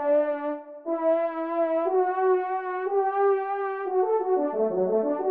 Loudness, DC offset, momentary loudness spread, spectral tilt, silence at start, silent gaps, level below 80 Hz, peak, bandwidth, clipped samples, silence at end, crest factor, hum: -26 LUFS; under 0.1%; 6 LU; -10 dB/octave; 0 s; none; -80 dBFS; -12 dBFS; 3.8 kHz; under 0.1%; 0 s; 12 dB; none